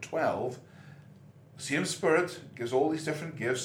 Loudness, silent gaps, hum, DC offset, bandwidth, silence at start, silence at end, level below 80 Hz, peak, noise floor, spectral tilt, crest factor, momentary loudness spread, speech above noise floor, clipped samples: -31 LUFS; none; none; under 0.1%; 17 kHz; 0 s; 0 s; -76 dBFS; -12 dBFS; -54 dBFS; -4.5 dB/octave; 20 dB; 16 LU; 23 dB; under 0.1%